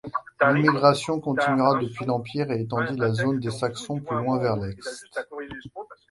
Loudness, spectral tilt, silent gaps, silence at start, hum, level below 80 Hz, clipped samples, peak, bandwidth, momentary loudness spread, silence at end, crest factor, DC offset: -24 LUFS; -6 dB/octave; none; 0.05 s; none; -58 dBFS; under 0.1%; -2 dBFS; 11.5 kHz; 17 LU; 0.15 s; 22 dB; under 0.1%